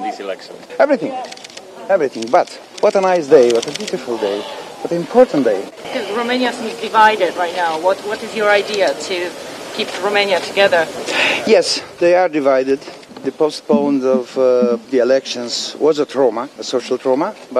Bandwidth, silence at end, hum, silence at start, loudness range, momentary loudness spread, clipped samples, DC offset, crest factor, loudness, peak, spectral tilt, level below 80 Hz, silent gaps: 14 kHz; 0 s; none; 0 s; 2 LU; 13 LU; under 0.1%; under 0.1%; 16 dB; -16 LUFS; 0 dBFS; -3.5 dB/octave; -64 dBFS; none